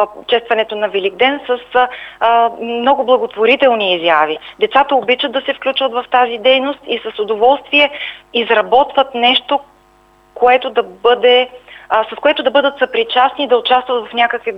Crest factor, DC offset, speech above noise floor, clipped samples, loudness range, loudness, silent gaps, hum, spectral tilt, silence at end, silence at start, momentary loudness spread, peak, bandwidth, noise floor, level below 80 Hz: 14 dB; under 0.1%; 36 dB; under 0.1%; 1 LU; -13 LUFS; none; none; -4.5 dB/octave; 0 s; 0 s; 7 LU; 0 dBFS; 5.6 kHz; -49 dBFS; -56 dBFS